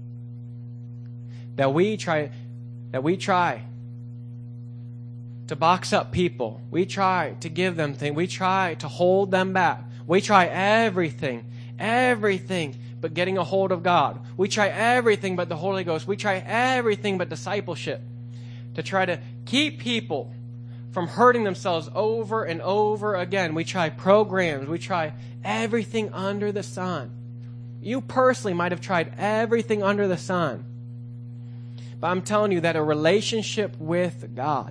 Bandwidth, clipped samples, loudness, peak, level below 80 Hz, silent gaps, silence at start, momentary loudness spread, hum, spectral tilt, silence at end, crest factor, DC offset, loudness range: 11 kHz; under 0.1%; -24 LUFS; -2 dBFS; -62 dBFS; none; 0 s; 19 LU; 60 Hz at -35 dBFS; -5.5 dB/octave; 0 s; 22 dB; under 0.1%; 5 LU